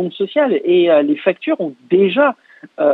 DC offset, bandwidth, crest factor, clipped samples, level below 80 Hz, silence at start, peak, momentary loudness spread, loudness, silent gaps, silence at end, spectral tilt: under 0.1%; 4.1 kHz; 14 dB; under 0.1%; -70 dBFS; 0 s; 0 dBFS; 8 LU; -15 LUFS; none; 0 s; -8.5 dB/octave